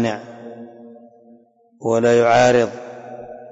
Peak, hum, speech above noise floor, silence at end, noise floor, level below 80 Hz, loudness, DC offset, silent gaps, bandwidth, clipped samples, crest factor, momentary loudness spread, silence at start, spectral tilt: -4 dBFS; none; 36 dB; 0.05 s; -52 dBFS; -58 dBFS; -16 LUFS; under 0.1%; none; 8 kHz; under 0.1%; 14 dB; 24 LU; 0 s; -5 dB/octave